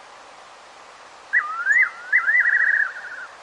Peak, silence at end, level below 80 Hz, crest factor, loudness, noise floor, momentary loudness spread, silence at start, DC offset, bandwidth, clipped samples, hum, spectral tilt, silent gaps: -8 dBFS; 0 s; -76 dBFS; 16 dB; -18 LUFS; -44 dBFS; 10 LU; 0.1 s; under 0.1%; 10.5 kHz; under 0.1%; none; 0.5 dB/octave; none